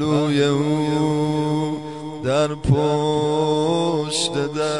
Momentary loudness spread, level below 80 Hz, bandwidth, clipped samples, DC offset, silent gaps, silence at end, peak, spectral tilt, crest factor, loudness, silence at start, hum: 5 LU; -46 dBFS; 11 kHz; under 0.1%; 0.3%; none; 0 s; -4 dBFS; -5.5 dB/octave; 16 dB; -20 LUFS; 0 s; none